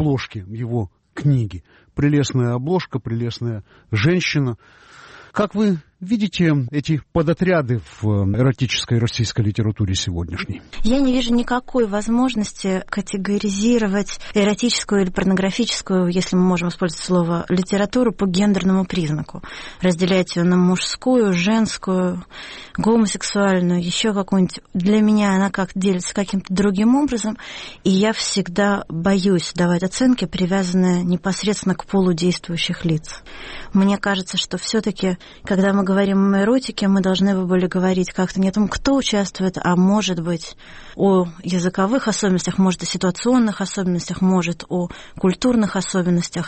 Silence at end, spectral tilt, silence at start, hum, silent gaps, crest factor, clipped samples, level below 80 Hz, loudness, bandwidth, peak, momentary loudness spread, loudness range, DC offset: 0 s; -5.5 dB/octave; 0 s; none; none; 12 dB; under 0.1%; -40 dBFS; -19 LUFS; 8.8 kHz; -6 dBFS; 8 LU; 3 LU; under 0.1%